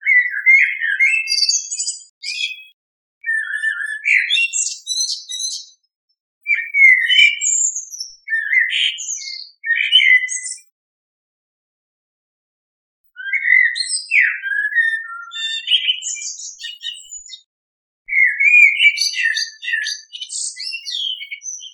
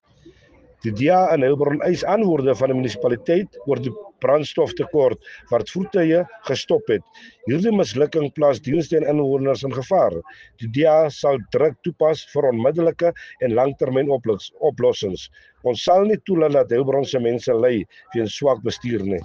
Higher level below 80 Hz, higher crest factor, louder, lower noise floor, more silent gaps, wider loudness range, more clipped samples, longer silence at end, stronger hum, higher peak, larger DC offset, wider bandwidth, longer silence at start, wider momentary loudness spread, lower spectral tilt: second, -76 dBFS vs -56 dBFS; about the same, 18 dB vs 14 dB; first, -14 LUFS vs -20 LUFS; first, under -90 dBFS vs -52 dBFS; first, 2.09-2.21 s, 2.73-3.21 s, 5.96-6.08 s, 6.20-6.41 s, 10.72-13.04 s, 17.46-18.05 s vs none; first, 6 LU vs 2 LU; neither; about the same, 0.05 s vs 0 s; neither; first, 0 dBFS vs -6 dBFS; neither; first, 17 kHz vs 7.4 kHz; second, 0 s vs 0.25 s; first, 18 LU vs 8 LU; second, 13 dB/octave vs -6.5 dB/octave